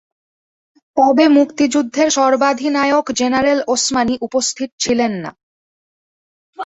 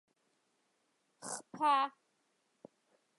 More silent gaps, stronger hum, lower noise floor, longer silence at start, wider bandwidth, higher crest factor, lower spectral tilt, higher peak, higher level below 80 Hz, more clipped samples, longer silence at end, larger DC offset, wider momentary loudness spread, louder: first, 4.72-4.78 s, 5.43-6.53 s vs none; neither; first, under -90 dBFS vs -79 dBFS; second, 0.95 s vs 1.2 s; second, 8.4 kHz vs 11.5 kHz; about the same, 16 dB vs 20 dB; first, -3 dB/octave vs -1.5 dB/octave; first, -2 dBFS vs -20 dBFS; first, -54 dBFS vs under -90 dBFS; neither; second, 0 s vs 1.3 s; neither; second, 8 LU vs 14 LU; first, -15 LUFS vs -35 LUFS